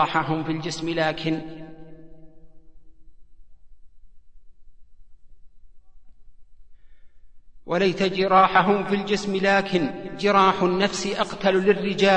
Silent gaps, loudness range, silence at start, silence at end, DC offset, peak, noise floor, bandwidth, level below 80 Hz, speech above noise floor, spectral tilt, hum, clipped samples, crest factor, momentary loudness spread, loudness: none; 12 LU; 0 s; 0 s; 0.6%; -4 dBFS; -46 dBFS; 9.8 kHz; -52 dBFS; 24 dB; -5 dB/octave; none; under 0.1%; 20 dB; 10 LU; -22 LUFS